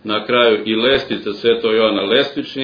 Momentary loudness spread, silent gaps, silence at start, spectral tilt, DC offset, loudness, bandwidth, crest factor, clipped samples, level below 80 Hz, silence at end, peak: 5 LU; none; 0.05 s; -6 dB/octave; under 0.1%; -15 LUFS; 5.4 kHz; 16 dB; under 0.1%; -52 dBFS; 0 s; 0 dBFS